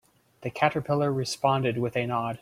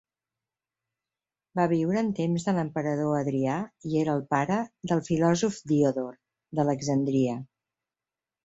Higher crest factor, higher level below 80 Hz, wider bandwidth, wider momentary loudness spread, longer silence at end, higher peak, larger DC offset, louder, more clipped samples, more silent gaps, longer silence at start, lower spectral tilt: about the same, 22 dB vs 18 dB; about the same, -64 dBFS vs -64 dBFS; first, 15.5 kHz vs 8 kHz; about the same, 5 LU vs 6 LU; second, 0.05 s vs 1 s; first, -6 dBFS vs -10 dBFS; neither; about the same, -26 LUFS vs -27 LUFS; neither; neither; second, 0.4 s vs 1.55 s; about the same, -5.5 dB/octave vs -6.5 dB/octave